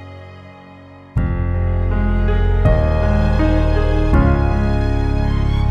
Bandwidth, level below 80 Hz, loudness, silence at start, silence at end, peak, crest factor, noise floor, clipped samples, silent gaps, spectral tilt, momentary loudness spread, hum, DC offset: 6.2 kHz; -18 dBFS; -17 LUFS; 0 s; 0 s; -2 dBFS; 14 dB; -39 dBFS; under 0.1%; none; -9 dB/octave; 6 LU; none; under 0.1%